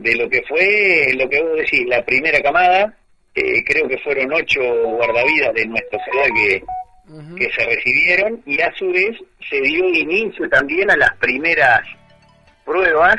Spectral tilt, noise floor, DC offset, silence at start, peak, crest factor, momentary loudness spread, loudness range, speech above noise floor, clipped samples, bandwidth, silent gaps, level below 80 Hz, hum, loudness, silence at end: -4.5 dB/octave; -51 dBFS; under 0.1%; 0 s; 0 dBFS; 16 dB; 8 LU; 2 LU; 35 dB; under 0.1%; 11 kHz; none; -48 dBFS; none; -15 LUFS; 0 s